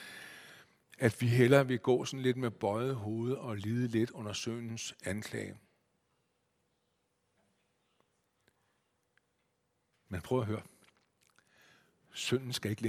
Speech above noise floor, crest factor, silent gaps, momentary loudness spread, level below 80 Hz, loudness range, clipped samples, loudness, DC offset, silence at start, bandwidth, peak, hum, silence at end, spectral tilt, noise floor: 47 dB; 26 dB; none; 17 LU; -70 dBFS; 14 LU; under 0.1%; -33 LUFS; under 0.1%; 0 s; 16 kHz; -10 dBFS; none; 0 s; -6 dB/octave; -79 dBFS